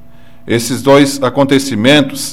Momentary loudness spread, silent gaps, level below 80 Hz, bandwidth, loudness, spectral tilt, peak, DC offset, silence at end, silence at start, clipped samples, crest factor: 7 LU; none; -46 dBFS; 16 kHz; -11 LUFS; -4.5 dB/octave; 0 dBFS; 3%; 0 s; 0.45 s; under 0.1%; 12 dB